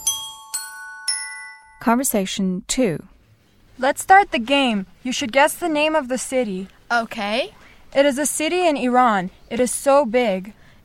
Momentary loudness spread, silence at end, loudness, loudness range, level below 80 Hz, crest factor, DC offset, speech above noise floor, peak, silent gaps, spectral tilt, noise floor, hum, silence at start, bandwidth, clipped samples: 12 LU; 0.35 s; -20 LUFS; 4 LU; -52 dBFS; 20 dB; under 0.1%; 35 dB; 0 dBFS; none; -3 dB/octave; -55 dBFS; none; 0 s; 17 kHz; under 0.1%